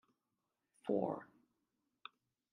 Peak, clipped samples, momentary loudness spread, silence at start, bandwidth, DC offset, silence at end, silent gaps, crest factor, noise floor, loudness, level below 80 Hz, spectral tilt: -22 dBFS; under 0.1%; 19 LU; 0.85 s; 10.5 kHz; under 0.1%; 1.3 s; none; 24 dB; -88 dBFS; -41 LUFS; under -90 dBFS; -8 dB/octave